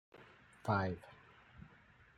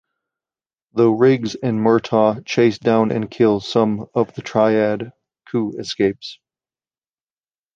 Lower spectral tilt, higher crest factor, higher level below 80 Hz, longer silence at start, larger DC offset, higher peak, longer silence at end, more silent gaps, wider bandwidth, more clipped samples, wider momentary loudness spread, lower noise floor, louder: about the same, -7.5 dB/octave vs -6.5 dB/octave; first, 22 dB vs 16 dB; second, -72 dBFS vs -58 dBFS; second, 0.15 s vs 0.95 s; neither; second, -20 dBFS vs -2 dBFS; second, 0.5 s vs 1.4 s; neither; first, 11 kHz vs 7.6 kHz; neither; first, 25 LU vs 10 LU; second, -65 dBFS vs under -90 dBFS; second, -39 LUFS vs -18 LUFS